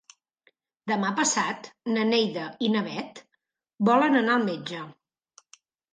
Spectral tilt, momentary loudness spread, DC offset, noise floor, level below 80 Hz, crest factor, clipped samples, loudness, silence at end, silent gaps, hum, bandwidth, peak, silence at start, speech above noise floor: -3.5 dB/octave; 15 LU; under 0.1%; -77 dBFS; -76 dBFS; 20 dB; under 0.1%; -25 LUFS; 1 s; none; none; 9.6 kHz; -8 dBFS; 0.85 s; 52 dB